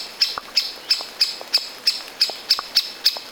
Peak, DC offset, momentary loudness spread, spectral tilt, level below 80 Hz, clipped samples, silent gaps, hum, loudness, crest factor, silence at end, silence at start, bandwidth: -2 dBFS; under 0.1%; 4 LU; 2 dB/octave; -64 dBFS; under 0.1%; none; none; -20 LUFS; 22 dB; 0 s; 0 s; over 20 kHz